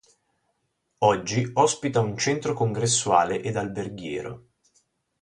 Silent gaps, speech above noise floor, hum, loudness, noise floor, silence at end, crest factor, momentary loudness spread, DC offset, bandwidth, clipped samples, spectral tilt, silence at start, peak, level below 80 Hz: none; 51 dB; none; -24 LUFS; -75 dBFS; 0.85 s; 20 dB; 11 LU; under 0.1%; 11.5 kHz; under 0.1%; -4 dB/octave; 1 s; -6 dBFS; -58 dBFS